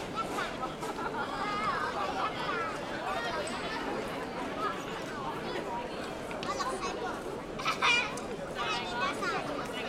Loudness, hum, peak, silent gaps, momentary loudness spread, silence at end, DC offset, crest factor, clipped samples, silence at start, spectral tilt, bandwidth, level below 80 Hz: -34 LUFS; none; -12 dBFS; none; 7 LU; 0 s; under 0.1%; 22 dB; under 0.1%; 0 s; -3.5 dB/octave; 16 kHz; -56 dBFS